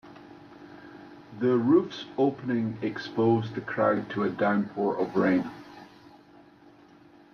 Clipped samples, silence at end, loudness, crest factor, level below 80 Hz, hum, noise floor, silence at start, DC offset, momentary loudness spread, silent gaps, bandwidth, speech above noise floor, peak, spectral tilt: under 0.1%; 1.5 s; -27 LUFS; 18 dB; -68 dBFS; none; -55 dBFS; 0.05 s; under 0.1%; 23 LU; none; 6.6 kHz; 29 dB; -12 dBFS; -8 dB/octave